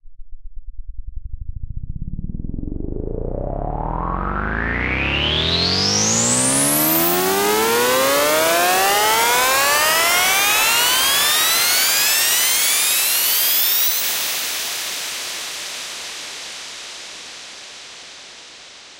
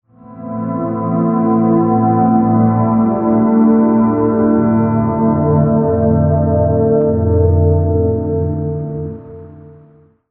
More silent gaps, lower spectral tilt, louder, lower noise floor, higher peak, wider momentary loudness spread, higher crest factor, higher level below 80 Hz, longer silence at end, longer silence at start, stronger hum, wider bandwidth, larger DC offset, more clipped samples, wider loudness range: neither; second, -1.5 dB/octave vs -14 dB/octave; about the same, -15 LUFS vs -14 LUFS; second, -41 dBFS vs -46 dBFS; about the same, -4 dBFS vs -2 dBFS; first, 20 LU vs 9 LU; about the same, 16 dB vs 12 dB; about the same, -34 dBFS vs -34 dBFS; second, 0 s vs 0.65 s; second, 0.05 s vs 0.3 s; neither; first, 16 kHz vs 2.5 kHz; neither; neither; first, 16 LU vs 3 LU